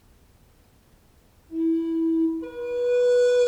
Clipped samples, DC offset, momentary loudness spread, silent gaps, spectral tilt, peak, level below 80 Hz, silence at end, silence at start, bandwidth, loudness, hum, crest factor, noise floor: under 0.1%; under 0.1%; 11 LU; none; -4.5 dB/octave; -14 dBFS; -60 dBFS; 0 s; 1.5 s; 9.4 kHz; -24 LUFS; none; 12 dB; -57 dBFS